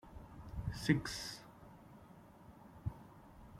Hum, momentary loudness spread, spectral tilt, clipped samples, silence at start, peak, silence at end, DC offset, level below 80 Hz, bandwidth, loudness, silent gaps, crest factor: none; 24 LU; -5 dB/octave; under 0.1%; 0.05 s; -16 dBFS; 0 s; under 0.1%; -56 dBFS; 16 kHz; -41 LUFS; none; 28 dB